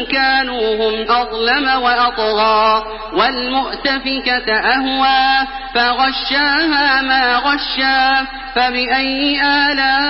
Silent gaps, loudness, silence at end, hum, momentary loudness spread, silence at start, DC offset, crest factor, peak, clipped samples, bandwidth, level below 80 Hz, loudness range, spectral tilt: none; -14 LUFS; 0 s; none; 5 LU; 0 s; under 0.1%; 14 dB; -2 dBFS; under 0.1%; 5.8 kHz; -40 dBFS; 1 LU; -6.5 dB/octave